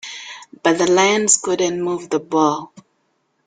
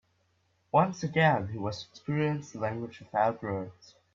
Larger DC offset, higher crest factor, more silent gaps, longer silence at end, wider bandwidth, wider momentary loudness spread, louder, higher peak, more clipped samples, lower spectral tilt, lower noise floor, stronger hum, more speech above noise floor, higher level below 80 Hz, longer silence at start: neither; about the same, 20 dB vs 22 dB; neither; first, 0.65 s vs 0.45 s; first, 9.8 kHz vs 7.4 kHz; first, 15 LU vs 12 LU; first, -17 LUFS vs -30 LUFS; first, 0 dBFS vs -10 dBFS; neither; second, -2.5 dB/octave vs -6.5 dB/octave; second, -67 dBFS vs -72 dBFS; neither; first, 49 dB vs 42 dB; first, -62 dBFS vs -68 dBFS; second, 0.05 s vs 0.75 s